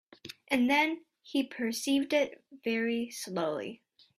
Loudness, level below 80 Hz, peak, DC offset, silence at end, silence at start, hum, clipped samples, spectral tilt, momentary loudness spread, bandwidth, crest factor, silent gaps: -31 LUFS; -74 dBFS; -14 dBFS; under 0.1%; 0.45 s; 0.25 s; none; under 0.1%; -3.5 dB/octave; 14 LU; 15.5 kHz; 18 dB; none